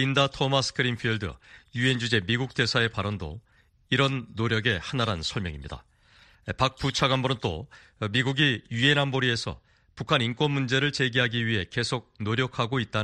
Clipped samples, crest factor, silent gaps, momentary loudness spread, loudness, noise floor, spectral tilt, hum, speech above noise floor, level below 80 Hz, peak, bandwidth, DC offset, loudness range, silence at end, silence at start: under 0.1%; 22 dB; none; 14 LU; -26 LUFS; -58 dBFS; -5 dB/octave; none; 31 dB; -50 dBFS; -6 dBFS; 10.5 kHz; under 0.1%; 4 LU; 0 s; 0 s